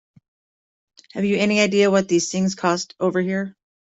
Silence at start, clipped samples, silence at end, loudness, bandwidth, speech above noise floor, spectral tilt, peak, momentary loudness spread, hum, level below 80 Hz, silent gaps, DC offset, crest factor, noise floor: 1.15 s; under 0.1%; 0.4 s; -20 LUFS; 8.2 kHz; over 70 dB; -4.5 dB/octave; -4 dBFS; 9 LU; none; -62 dBFS; none; under 0.1%; 16 dB; under -90 dBFS